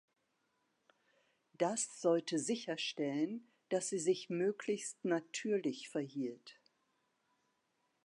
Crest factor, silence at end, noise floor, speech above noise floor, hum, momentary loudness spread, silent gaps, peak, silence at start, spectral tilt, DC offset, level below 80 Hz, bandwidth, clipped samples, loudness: 20 dB; 1.5 s; -82 dBFS; 44 dB; none; 7 LU; none; -20 dBFS; 1.6 s; -4 dB/octave; under 0.1%; under -90 dBFS; 11.5 kHz; under 0.1%; -38 LUFS